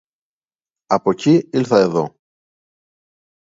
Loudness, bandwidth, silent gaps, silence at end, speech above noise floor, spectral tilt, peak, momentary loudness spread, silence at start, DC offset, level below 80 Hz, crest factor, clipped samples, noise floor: -17 LUFS; 7.8 kHz; none; 1.35 s; over 75 dB; -7 dB/octave; 0 dBFS; 7 LU; 0.9 s; under 0.1%; -62 dBFS; 20 dB; under 0.1%; under -90 dBFS